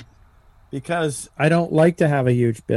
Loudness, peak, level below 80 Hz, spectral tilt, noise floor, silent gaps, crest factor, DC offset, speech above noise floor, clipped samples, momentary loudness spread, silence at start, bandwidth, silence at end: -19 LUFS; -4 dBFS; -54 dBFS; -7 dB/octave; -51 dBFS; none; 16 dB; under 0.1%; 33 dB; under 0.1%; 10 LU; 0 s; 12.5 kHz; 0 s